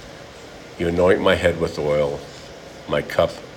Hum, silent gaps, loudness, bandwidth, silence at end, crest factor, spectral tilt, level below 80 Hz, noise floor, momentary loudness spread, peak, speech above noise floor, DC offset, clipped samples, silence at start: none; none; -20 LUFS; 16.5 kHz; 0 s; 20 dB; -5.5 dB/octave; -46 dBFS; -39 dBFS; 22 LU; -2 dBFS; 20 dB; under 0.1%; under 0.1%; 0 s